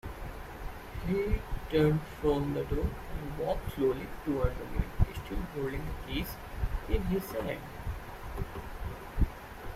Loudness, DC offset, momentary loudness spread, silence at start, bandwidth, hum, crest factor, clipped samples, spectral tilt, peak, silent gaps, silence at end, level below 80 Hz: -35 LUFS; under 0.1%; 12 LU; 0.05 s; 16 kHz; none; 22 dB; under 0.1%; -7 dB/octave; -12 dBFS; none; 0 s; -38 dBFS